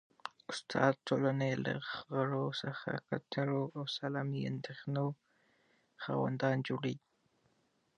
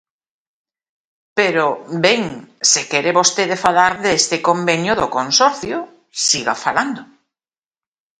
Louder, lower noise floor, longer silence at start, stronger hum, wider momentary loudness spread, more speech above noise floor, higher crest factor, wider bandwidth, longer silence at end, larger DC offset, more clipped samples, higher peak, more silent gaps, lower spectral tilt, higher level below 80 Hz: second, -37 LUFS vs -16 LUFS; second, -76 dBFS vs under -90 dBFS; second, 0.25 s vs 1.35 s; neither; about the same, 11 LU vs 11 LU; second, 40 dB vs over 74 dB; first, 24 dB vs 18 dB; second, 9.6 kHz vs 11.5 kHz; second, 1 s vs 1.15 s; neither; neither; second, -14 dBFS vs 0 dBFS; neither; first, -6.5 dB/octave vs -2 dB/octave; second, -78 dBFS vs -56 dBFS